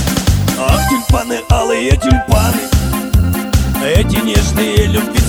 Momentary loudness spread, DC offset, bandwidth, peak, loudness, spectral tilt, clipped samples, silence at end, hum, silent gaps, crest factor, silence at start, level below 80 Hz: 3 LU; under 0.1%; over 20 kHz; 0 dBFS; -13 LUFS; -5 dB/octave; under 0.1%; 0 s; none; none; 12 dB; 0 s; -18 dBFS